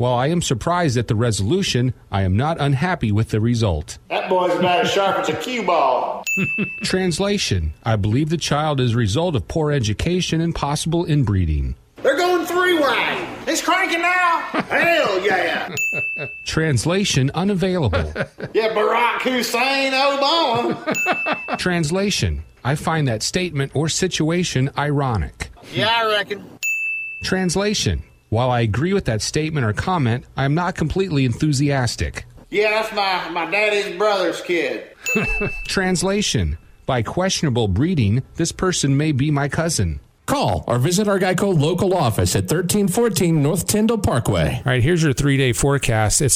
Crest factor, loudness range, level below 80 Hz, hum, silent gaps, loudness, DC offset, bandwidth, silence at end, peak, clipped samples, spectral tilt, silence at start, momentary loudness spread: 14 dB; 3 LU; -36 dBFS; none; none; -19 LUFS; under 0.1%; 16 kHz; 0 s; -4 dBFS; under 0.1%; -4.5 dB/octave; 0 s; 6 LU